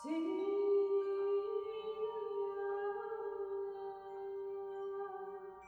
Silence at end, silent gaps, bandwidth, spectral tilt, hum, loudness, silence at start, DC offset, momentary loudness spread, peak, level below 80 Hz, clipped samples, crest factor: 0 s; none; 5.4 kHz; -5.5 dB/octave; none; -40 LUFS; 0 s; under 0.1%; 12 LU; -26 dBFS; -80 dBFS; under 0.1%; 14 dB